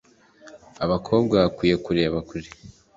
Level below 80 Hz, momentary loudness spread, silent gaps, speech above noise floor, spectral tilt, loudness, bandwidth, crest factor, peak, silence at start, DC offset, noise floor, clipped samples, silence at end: -48 dBFS; 16 LU; none; 28 dB; -7 dB/octave; -22 LUFS; 7.8 kHz; 20 dB; -4 dBFS; 0.45 s; under 0.1%; -50 dBFS; under 0.1%; 0.25 s